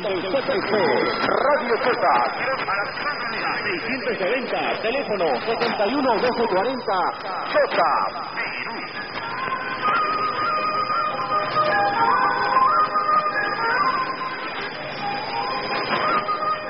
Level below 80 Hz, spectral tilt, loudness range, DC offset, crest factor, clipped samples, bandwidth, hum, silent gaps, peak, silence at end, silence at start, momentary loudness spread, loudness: -56 dBFS; -8 dB/octave; 4 LU; 0.4%; 16 dB; under 0.1%; 5.8 kHz; none; none; -6 dBFS; 0 s; 0 s; 8 LU; -22 LUFS